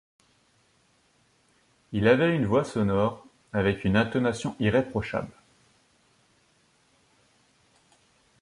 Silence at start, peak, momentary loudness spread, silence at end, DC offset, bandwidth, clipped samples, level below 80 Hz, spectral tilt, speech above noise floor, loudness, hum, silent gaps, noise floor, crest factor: 1.9 s; -8 dBFS; 11 LU; 3.1 s; under 0.1%; 11.5 kHz; under 0.1%; -52 dBFS; -7 dB/octave; 41 dB; -26 LUFS; none; none; -66 dBFS; 20 dB